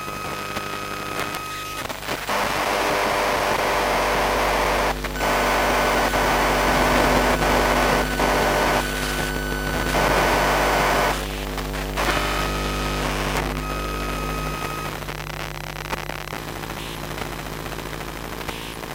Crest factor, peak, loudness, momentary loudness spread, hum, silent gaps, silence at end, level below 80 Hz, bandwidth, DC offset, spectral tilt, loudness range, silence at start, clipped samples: 20 dB; -2 dBFS; -22 LUFS; 12 LU; 50 Hz at -30 dBFS; none; 0 s; -32 dBFS; 17 kHz; under 0.1%; -3.5 dB/octave; 10 LU; 0 s; under 0.1%